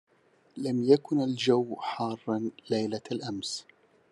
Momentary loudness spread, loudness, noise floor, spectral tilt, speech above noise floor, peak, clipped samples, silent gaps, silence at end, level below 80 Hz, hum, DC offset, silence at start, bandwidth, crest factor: 11 LU; -29 LUFS; -64 dBFS; -5.5 dB/octave; 36 dB; -8 dBFS; under 0.1%; none; 0.5 s; -78 dBFS; none; under 0.1%; 0.55 s; 11.5 kHz; 20 dB